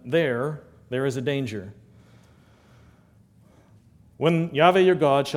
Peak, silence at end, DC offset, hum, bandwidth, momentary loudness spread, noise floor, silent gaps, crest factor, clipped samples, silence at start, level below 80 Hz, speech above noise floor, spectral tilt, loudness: -2 dBFS; 0 s; under 0.1%; none; 14 kHz; 16 LU; -56 dBFS; none; 22 dB; under 0.1%; 0.05 s; -62 dBFS; 34 dB; -6.5 dB/octave; -23 LUFS